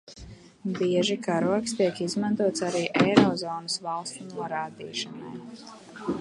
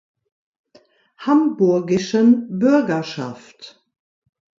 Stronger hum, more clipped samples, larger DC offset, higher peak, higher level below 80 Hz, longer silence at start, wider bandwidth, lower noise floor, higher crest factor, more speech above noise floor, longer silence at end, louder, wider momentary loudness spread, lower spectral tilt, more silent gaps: neither; neither; neither; about the same, -2 dBFS vs -4 dBFS; about the same, -60 dBFS vs -64 dBFS; second, 0.1 s vs 1.2 s; first, 11.5 kHz vs 7.6 kHz; second, -47 dBFS vs -55 dBFS; first, 24 dB vs 16 dB; second, 20 dB vs 37 dB; second, 0 s vs 0.9 s; second, -27 LUFS vs -18 LUFS; first, 19 LU vs 14 LU; second, -5 dB/octave vs -6.5 dB/octave; neither